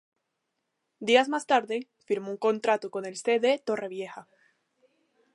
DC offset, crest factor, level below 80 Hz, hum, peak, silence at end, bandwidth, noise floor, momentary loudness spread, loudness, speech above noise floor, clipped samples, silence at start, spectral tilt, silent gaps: under 0.1%; 22 dB; -84 dBFS; none; -6 dBFS; 1.1 s; 11 kHz; -81 dBFS; 13 LU; -27 LUFS; 54 dB; under 0.1%; 1 s; -3.5 dB/octave; none